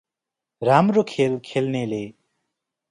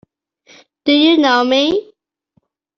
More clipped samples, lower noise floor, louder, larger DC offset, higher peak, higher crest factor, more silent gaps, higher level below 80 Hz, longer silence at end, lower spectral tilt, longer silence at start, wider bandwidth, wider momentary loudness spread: neither; first, -86 dBFS vs -63 dBFS; second, -21 LUFS vs -13 LUFS; neither; about the same, -2 dBFS vs -2 dBFS; first, 20 dB vs 14 dB; neither; second, -66 dBFS vs -58 dBFS; second, 0.8 s vs 0.95 s; first, -7 dB/octave vs -3 dB/octave; second, 0.6 s vs 0.85 s; first, 11 kHz vs 7 kHz; about the same, 12 LU vs 10 LU